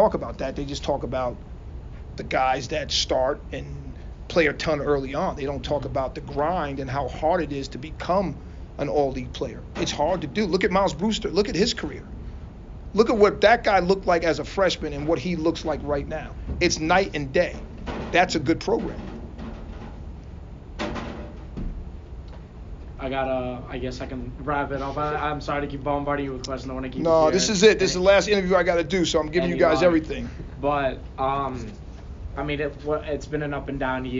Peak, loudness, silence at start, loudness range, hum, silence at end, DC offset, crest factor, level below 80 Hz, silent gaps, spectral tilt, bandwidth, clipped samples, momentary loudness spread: -4 dBFS; -24 LUFS; 0 s; 10 LU; none; 0 s; under 0.1%; 20 dB; -38 dBFS; none; -4 dB/octave; 7.4 kHz; under 0.1%; 20 LU